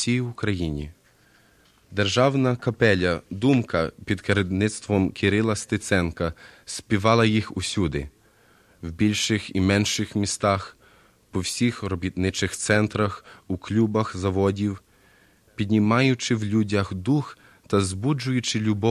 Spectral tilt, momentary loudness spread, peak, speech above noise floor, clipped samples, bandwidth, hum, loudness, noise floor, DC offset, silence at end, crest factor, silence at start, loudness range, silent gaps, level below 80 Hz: -5 dB/octave; 12 LU; -4 dBFS; 35 dB; under 0.1%; 13.5 kHz; none; -24 LUFS; -58 dBFS; under 0.1%; 0 s; 20 dB; 0 s; 2 LU; none; -44 dBFS